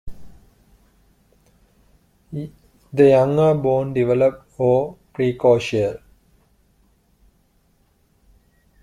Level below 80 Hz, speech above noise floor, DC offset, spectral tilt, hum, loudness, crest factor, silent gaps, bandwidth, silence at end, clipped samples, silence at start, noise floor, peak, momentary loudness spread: -50 dBFS; 44 dB; under 0.1%; -7.5 dB/octave; none; -18 LUFS; 18 dB; none; 11 kHz; 2.85 s; under 0.1%; 0.05 s; -61 dBFS; -2 dBFS; 18 LU